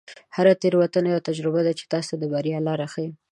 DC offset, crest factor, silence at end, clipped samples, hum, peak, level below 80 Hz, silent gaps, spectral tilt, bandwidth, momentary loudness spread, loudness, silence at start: under 0.1%; 18 dB; 0.15 s; under 0.1%; none; -6 dBFS; -72 dBFS; none; -6.5 dB/octave; 11 kHz; 9 LU; -23 LUFS; 0.1 s